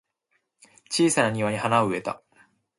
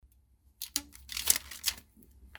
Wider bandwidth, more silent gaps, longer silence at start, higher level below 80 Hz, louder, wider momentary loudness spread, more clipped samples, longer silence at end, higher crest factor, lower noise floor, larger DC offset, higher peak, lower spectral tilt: second, 11.5 kHz vs over 20 kHz; neither; first, 0.9 s vs 0.6 s; second, -64 dBFS vs -58 dBFS; first, -24 LUFS vs -32 LUFS; second, 12 LU vs 15 LU; neither; first, 0.65 s vs 0 s; second, 20 dB vs 30 dB; first, -74 dBFS vs -65 dBFS; neither; about the same, -6 dBFS vs -6 dBFS; first, -4 dB/octave vs 1 dB/octave